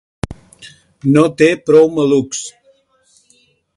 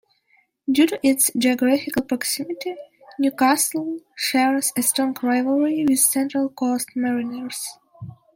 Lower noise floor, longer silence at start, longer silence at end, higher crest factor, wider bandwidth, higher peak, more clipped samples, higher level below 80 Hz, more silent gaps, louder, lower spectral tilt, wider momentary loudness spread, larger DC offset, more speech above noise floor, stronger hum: second, -55 dBFS vs -63 dBFS; second, 0.3 s vs 0.7 s; first, 1.25 s vs 0.25 s; about the same, 16 dB vs 18 dB; second, 11.5 kHz vs 16.5 kHz; about the same, 0 dBFS vs -2 dBFS; neither; first, -46 dBFS vs -66 dBFS; neither; first, -13 LUFS vs -21 LUFS; first, -5.5 dB/octave vs -2.5 dB/octave; first, 18 LU vs 13 LU; neither; about the same, 43 dB vs 42 dB; neither